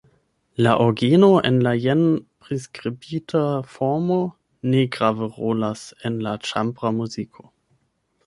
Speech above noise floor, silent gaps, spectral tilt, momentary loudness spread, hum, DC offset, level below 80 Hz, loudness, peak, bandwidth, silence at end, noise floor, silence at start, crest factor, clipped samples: 48 dB; none; -7 dB/octave; 14 LU; none; under 0.1%; -60 dBFS; -21 LUFS; -2 dBFS; 11.5 kHz; 1 s; -68 dBFS; 0.6 s; 20 dB; under 0.1%